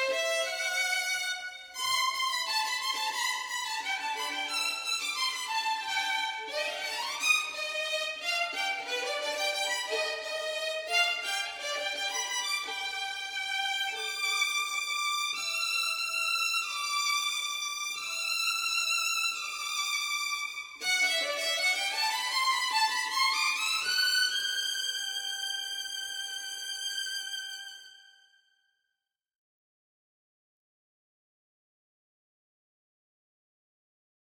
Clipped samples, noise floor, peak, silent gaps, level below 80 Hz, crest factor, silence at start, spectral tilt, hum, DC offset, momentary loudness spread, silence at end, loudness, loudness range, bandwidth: under 0.1%; -87 dBFS; -12 dBFS; none; -78 dBFS; 20 dB; 0 s; 3 dB/octave; none; under 0.1%; 7 LU; 6.2 s; -29 LUFS; 6 LU; over 20 kHz